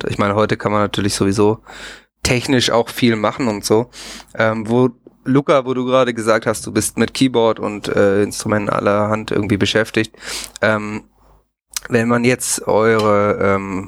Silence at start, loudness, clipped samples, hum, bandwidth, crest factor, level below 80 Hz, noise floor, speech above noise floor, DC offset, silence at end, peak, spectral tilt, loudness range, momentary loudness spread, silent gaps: 0 s; -17 LUFS; under 0.1%; none; 16.5 kHz; 16 dB; -46 dBFS; -53 dBFS; 37 dB; under 0.1%; 0 s; -2 dBFS; -4.5 dB/octave; 2 LU; 11 LU; none